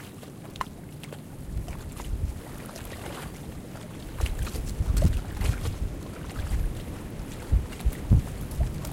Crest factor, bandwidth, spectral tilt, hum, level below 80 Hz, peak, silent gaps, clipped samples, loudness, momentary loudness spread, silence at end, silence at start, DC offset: 22 dB; 16.5 kHz; -6 dB/octave; none; -32 dBFS; -8 dBFS; none; under 0.1%; -32 LUFS; 15 LU; 0 s; 0 s; under 0.1%